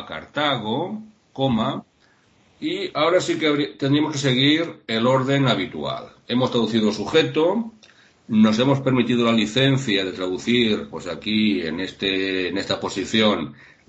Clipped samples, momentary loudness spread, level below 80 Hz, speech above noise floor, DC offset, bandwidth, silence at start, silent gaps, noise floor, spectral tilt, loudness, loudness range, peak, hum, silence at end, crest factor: under 0.1%; 10 LU; -58 dBFS; 38 dB; under 0.1%; 8.4 kHz; 0 s; none; -59 dBFS; -5.5 dB/octave; -21 LUFS; 3 LU; -4 dBFS; none; 0.35 s; 18 dB